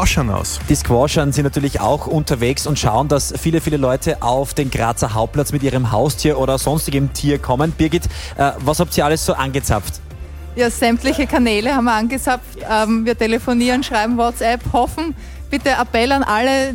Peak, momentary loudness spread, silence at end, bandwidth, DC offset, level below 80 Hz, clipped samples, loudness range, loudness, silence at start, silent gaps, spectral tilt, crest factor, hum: -2 dBFS; 5 LU; 0 s; 17 kHz; under 0.1%; -30 dBFS; under 0.1%; 1 LU; -17 LUFS; 0 s; none; -5 dB/octave; 16 dB; none